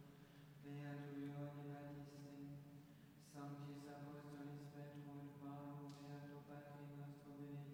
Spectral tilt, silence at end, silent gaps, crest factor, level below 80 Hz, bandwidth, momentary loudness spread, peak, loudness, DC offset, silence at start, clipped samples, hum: -7.5 dB/octave; 0 s; none; 14 dB; -84 dBFS; 16.5 kHz; 9 LU; -42 dBFS; -56 LUFS; under 0.1%; 0 s; under 0.1%; none